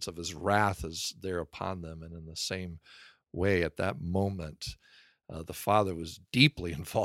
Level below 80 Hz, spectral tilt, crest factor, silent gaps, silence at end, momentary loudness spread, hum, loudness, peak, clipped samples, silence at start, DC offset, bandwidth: -52 dBFS; -4.5 dB/octave; 24 dB; none; 0 s; 19 LU; none; -31 LUFS; -8 dBFS; under 0.1%; 0 s; under 0.1%; 16.5 kHz